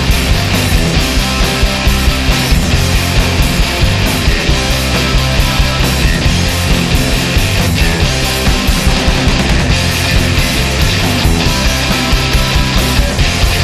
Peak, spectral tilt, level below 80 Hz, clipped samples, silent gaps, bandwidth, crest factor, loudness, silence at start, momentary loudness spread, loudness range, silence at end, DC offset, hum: 0 dBFS; -4 dB/octave; -16 dBFS; under 0.1%; none; 14 kHz; 10 dB; -12 LUFS; 0 s; 1 LU; 0 LU; 0 s; 0.1%; none